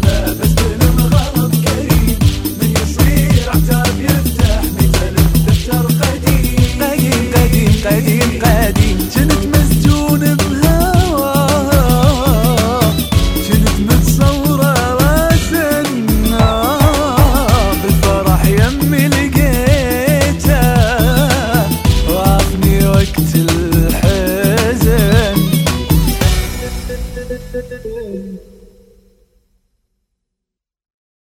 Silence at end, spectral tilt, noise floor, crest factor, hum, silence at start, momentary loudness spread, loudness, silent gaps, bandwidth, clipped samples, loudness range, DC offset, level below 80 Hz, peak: 2.85 s; -5.5 dB/octave; -81 dBFS; 12 dB; none; 0 s; 3 LU; -12 LUFS; none; 19 kHz; under 0.1%; 4 LU; under 0.1%; -18 dBFS; 0 dBFS